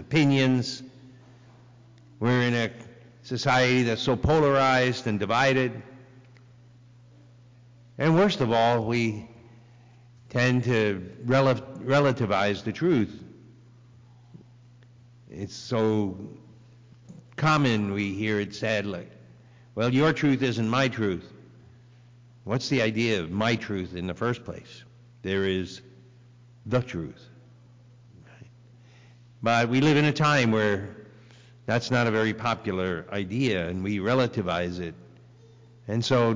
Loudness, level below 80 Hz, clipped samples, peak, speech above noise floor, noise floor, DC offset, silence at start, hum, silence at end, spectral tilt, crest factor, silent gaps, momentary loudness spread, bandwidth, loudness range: -25 LUFS; -52 dBFS; under 0.1%; -14 dBFS; 28 dB; -53 dBFS; under 0.1%; 0 s; 60 Hz at -50 dBFS; 0 s; -6 dB/octave; 12 dB; none; 17 LU; 7.6 kHz; 9 LU